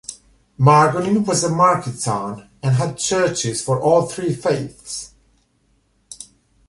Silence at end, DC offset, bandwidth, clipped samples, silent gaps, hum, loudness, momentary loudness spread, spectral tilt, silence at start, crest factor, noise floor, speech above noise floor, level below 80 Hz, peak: 0.45 s; under 0.1%; 11.5 kHz; under 0.1%; none; none; -18 LUFS; 16 LU; -5 dB/octave; 0.1 s; 18 dB; -62 dBFS; 44 dB; -54 dBFS; -2 dBFS